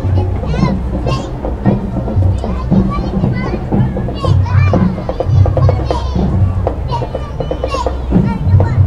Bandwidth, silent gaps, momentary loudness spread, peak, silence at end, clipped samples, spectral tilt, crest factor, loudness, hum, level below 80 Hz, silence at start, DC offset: 7.6 kHz; none; 7 LU; 0 dBFS; 0 s; under 0.1%; -8.5 dB/octave; 12 dB; -15 LUFS; none; -20 dBFS; 0 s; 1%